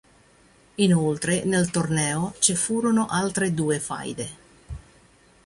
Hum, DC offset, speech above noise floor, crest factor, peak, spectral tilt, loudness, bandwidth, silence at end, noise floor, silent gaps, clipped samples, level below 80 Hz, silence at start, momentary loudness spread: none; under 0.1%; 33 dB; 20 dB; -4 dBFS; -4.5 dB/octave; -23 LUFS; 11.5 kHz; 0.7 s; -56 dBFS; none; under 0.1%; -52 dBFS; 0.8 s; 18 LU